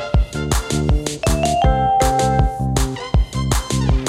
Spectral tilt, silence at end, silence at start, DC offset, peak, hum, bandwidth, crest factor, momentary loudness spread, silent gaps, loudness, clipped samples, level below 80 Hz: -5 dB/octave; 0 s; 0 s; under 0.1%; -2 dBFS; none; 15.5 kHz; 16 dB; 5 LU; none; -18 LUFS; under 0.1%; -22 dBFS